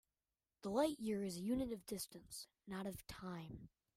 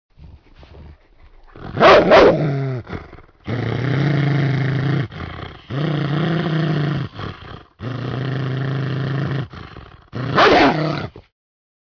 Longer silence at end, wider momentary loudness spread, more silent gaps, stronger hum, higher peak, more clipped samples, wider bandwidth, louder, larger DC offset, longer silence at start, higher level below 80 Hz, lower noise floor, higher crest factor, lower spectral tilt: second, 0.3 s vs 0.65 s; second, 14 LU vs 22 LU; neither; neither; second, -26 dBFS vs 0 dBFS; neither; first, 16 kHz vs 5.4 kHz; second, -45 LUFS vs -17 LUFS; neither; first, 0.65 s vs 0.2 s; second, -68 dBFS vs -44 dBFS; first, under -90 dBFS vs -47 dBFS; about the same, 20 dB vs 18 dB; second, -5 dB/octave vs -7.5 dB/octave